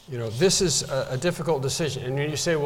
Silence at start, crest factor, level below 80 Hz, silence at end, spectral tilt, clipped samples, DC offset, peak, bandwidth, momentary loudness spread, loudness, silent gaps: 0.1 s; 16 dB; -50 dBFS; 0 s; -4 dB/octave; under 0.1%; under 0.1%; -10 dBFS; 17 kHz; 7 LU; -24 LUFS; none